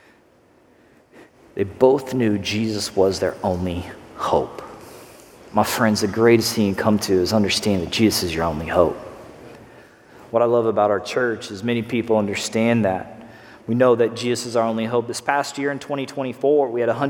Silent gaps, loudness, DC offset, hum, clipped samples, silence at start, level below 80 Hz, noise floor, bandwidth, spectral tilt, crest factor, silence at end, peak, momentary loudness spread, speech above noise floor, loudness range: none; -20 LUFS; under 0.1%; none; under 0.1%; 1.15 s; -50 dBFS; -55 dBFS; 17.5 kHz; -5 dB/octave; 20 dB; 0 s; -2 dBFS; 13 LU; 35 dB; 4 LU